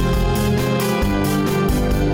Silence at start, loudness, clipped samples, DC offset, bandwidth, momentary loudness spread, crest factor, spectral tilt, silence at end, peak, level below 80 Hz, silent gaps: 0 s; -19 LUFS; under 0.1%; under 0.1%; 17 kHz; 0 LU; 10 dB; -6 dB/octave; 0 s; -8 dBFS; -24 dBFS; none